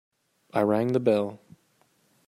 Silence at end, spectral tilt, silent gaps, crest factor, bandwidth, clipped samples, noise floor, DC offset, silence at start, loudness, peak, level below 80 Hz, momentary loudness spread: 0.9 s; -8 dB/octave; none; 20 dB; 16 kHz; under 0.1%; -67 dBFS; under 0.1%; 0.55 s; -26 LUFS; -8 dBFS; -70 dBFS; 8 LU